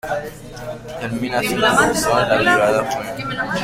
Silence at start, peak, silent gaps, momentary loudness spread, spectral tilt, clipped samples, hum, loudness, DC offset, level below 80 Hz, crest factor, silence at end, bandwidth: 0.05 s; -2 dBFS; none; 17 LU; -3.5 dB/octave; under 0.1%; none; -18 LUFS; under 0.1%; -44 dBFS; 18 dB; 0 s; 16.5 kHz